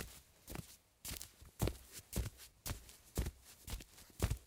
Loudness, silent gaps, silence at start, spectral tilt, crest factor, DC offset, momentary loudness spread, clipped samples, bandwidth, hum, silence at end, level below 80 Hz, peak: -47 LUFS; none; 0 s; -4.5 dB/octave; 28 dB; under 0.1%; 11 LU; under 0.1%; 17.5 kHz; none; 0 s; -50 dBFS; -18 dBFS